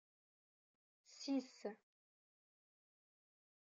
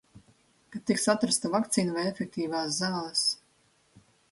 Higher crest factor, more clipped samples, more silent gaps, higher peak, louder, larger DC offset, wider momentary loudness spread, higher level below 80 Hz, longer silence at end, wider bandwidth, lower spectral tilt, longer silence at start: about the same, 20 dB vs 22 dB; neither; neither; second, -32 dBFS vs -10 dBFS; second, -47 LUFS vs -28 LUFS; neither; first, 20 LU vs 8 LU; second, under -90 dBFS vs -70 dBFS; first, 1.9 s vs 0.95 s; second, 7.6 kHz vs 12 kHz; about the same, -4 dB/octave vs -3.5 dB/octave; first, 1.1 s vs 0.15 s